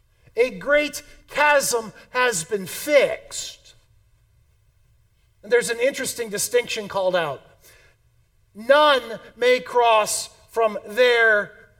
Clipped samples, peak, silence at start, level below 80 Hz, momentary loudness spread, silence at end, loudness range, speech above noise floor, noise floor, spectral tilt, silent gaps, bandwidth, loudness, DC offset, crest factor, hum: under 0.1%; -2 dBFS; 0.35 s; -58 dBFS; 13 LU; 0.3 s; 6 LU; 40 dB; -61 dBFS; -1.5 dB/octave; none; 18 kHz; -21 LUFS; under 0.1%; 20 dB; none